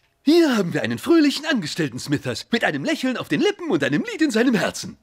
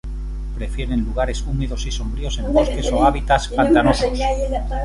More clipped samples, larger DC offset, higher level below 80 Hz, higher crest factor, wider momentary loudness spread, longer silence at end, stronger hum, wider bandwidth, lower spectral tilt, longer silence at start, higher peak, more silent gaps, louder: neither; neither; second, -62 dBFS vs -24 dBFS; about the same, 14 dB vs 16 dB; second, 8 LU vs 12 LU; about the same, 0.1 s vs 0 s; neither; first, 16 kHz vs 11.5 kHz; about the same, -5 dB/octave vs -5.5 dB/octave; first, 0.25 s vs 0.05 s; second, -6 dBFS vs -2 dBFS; neither; about the same, -21 LUFS vs -20 LUFS